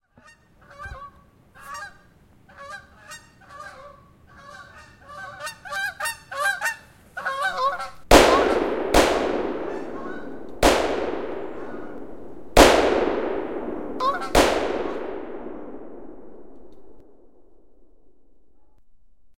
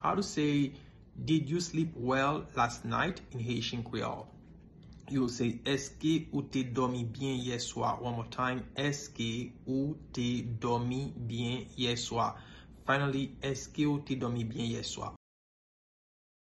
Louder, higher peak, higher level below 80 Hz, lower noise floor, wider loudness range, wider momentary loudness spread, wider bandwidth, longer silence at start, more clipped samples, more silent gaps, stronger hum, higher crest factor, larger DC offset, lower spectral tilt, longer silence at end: first, -22 LUFS vs -34 LUFS; first, 0 dBFS vs -16 dBFS; first, -38 dBFS vs -56 dBFS; first, -59 dBFS vs -54 dBFS; first, 21 LU vs 2 LU; first, 26 LU vs 8 LU; first, 16 kHz vs 12 kHz; about the same, 0 s vs 0 s; neither; neither; neither; about the same, 24 dB vs 20 dB; neither; second, -3.5 dB/octave vs -5 dB/octave; second, 0 s vs 1.3 s